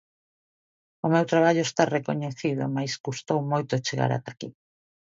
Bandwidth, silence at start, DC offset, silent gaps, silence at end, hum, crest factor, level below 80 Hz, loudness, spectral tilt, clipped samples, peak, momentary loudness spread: 7.8 kHz; 1.05 s; under 0.1%; 3.00-3.04 s; 0.55 s; none; 22 dB; -70 dBFS; -26 LUFS; -5.5 dB/octave; under 0.1%; -4 dBFS; 11 LU